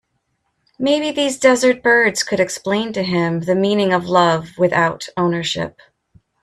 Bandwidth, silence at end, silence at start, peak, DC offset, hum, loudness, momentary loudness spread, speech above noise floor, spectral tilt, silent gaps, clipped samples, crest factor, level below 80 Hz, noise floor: 14 kHz; 0.75 s; 0.8 s; 0 dBFS; under 0.1%; none; -17 LUFS; 7 LU; 53 dB; -4.5 dB/octave; none; under 0.1%; 18 dB; -56 dBFS; -69 dBFS